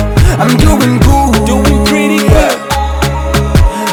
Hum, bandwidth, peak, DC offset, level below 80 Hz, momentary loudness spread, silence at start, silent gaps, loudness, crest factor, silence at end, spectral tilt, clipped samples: none; 20 kHz; 0 dBFS; under 0.1%; -14 dBFS; 5 LU; 0 s; none; -9 LUFS; 8 dB; 0 s; -5.5 dB/octave; 1%